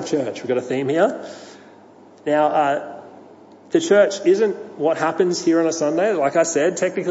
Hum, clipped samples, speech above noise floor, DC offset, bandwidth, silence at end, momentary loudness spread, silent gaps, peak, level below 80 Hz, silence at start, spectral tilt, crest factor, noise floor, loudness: none; under 0.1%; 27 dB; under 0.1%; 8 kHz; 0 s; 10 LU; none; -2 dBFS; -76 dBFS; 0 s; -4.5 dB/octave; 16 dB; -46 dBFS; -19 LUFS